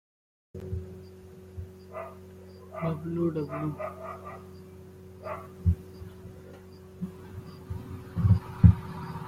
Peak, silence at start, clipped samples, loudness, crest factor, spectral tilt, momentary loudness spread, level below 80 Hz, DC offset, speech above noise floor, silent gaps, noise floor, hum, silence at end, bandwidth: -4 dBFS; 0.55 s; under 0.1%; -30 LUFS; 28 dB; -9.5 dB/octave; 23 LU; -44 dBFS; under 0.1%; 15 dB; none; -48 dBFS; none; 0 s; 9.6 kHz